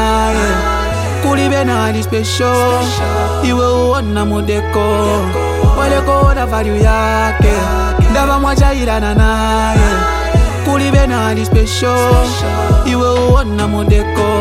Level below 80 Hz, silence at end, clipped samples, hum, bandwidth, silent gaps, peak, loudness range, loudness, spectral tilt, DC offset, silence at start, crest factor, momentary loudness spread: -16 dBFS; 0 s; under 0.1%; none; 15.5 kHz; none; 0 dBFS; 1 LU; -13 LUFS; -5.5 dB/octave; under 0.1%; 0 s; 12 dB; 4 LU